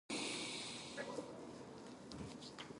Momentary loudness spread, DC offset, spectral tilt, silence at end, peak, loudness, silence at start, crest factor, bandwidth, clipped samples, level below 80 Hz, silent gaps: 11 LU; under 0.1%; -3 dB/octave; 0 s; -32 dBFS; -47 LUFS; 0.1 s; 16 dB; 11.5 kHz; under 0.1%; -72 dBFS; none